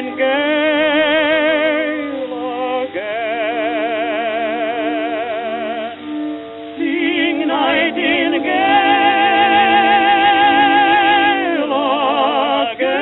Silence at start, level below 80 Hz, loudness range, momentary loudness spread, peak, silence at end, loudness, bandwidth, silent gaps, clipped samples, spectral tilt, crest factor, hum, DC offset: 0 s; -56 dBFS; 8 LU; 11 LU; 0 dBFS; 0 s; -15 LUFS; 4.1 kHz; none; under 0.1%; 0 dB/octave; 14 dB; none; under 0.1%